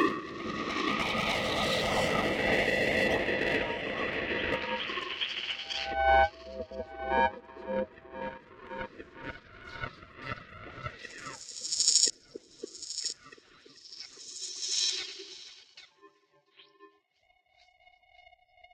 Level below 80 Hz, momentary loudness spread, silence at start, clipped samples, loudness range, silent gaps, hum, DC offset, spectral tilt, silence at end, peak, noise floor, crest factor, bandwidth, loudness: -54 dBFS; 19 LU; 0 s; under 0.1%; 12 LU; none; none; under 0.1%; -2 dB/octave; 0.55 s; -6 dBFS; -71 dBFS; 28 dB; 16.5 kHz; -30 LUFS